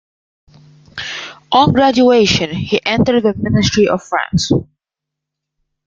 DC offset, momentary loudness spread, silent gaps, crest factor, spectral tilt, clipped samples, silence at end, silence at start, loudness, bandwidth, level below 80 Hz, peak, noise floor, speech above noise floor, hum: under 0.1%; 14 LU; none; 14 dB; -5 dB/octave; under 0.1%; 1.25 s; 0.95 s; -14 LUFS; 7.6 kHz; -42 dBFS; 0 dBFS; -82 dBFS; 69 dB; none